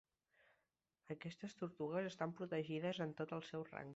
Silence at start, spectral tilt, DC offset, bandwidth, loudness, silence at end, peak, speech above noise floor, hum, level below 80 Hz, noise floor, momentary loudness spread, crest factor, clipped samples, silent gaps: 1.05 s; -5.5 dB/octave; under 0.1%; 8 kHz; -46 LUFS; 0 s; -28 dBFS; 42 dB; none; -84 dBFS; -88 dBFS; 8 LU; 20 dB; under 0.1%; none